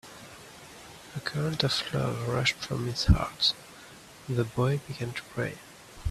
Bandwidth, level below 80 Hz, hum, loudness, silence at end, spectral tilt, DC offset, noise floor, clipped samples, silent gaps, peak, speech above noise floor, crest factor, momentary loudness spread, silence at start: 14.5 kHz; -40 dBFS; none; -29 LUFS; 0 s; -5 dB/octave; under 0.1%; -50 dBFS; under 0.1%; none; -6 dBFS; 21 dB; 24 dB; 21 LU; 0.05 s